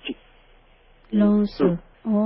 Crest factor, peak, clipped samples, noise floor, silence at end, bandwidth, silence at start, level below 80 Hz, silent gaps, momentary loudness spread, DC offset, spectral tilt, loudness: 16 dB; -6 dBFS; under 0.1%; -54 dBFS; 0 s; 5.8 kHz; 0.05 s; -50 dBFS; none; 15 LU; under 0.1%; -12 dB/octave; -22 LUFS